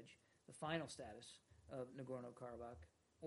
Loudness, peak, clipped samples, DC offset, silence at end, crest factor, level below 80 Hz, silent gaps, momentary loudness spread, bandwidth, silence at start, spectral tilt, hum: -52 LUFS; -28 dBFS; under 0.1%; under 0.1%; 0 s; 24 dB; -74 dBFS; none; 18 LU; 11.5 kHz; 0 s; -5 dB/octave; none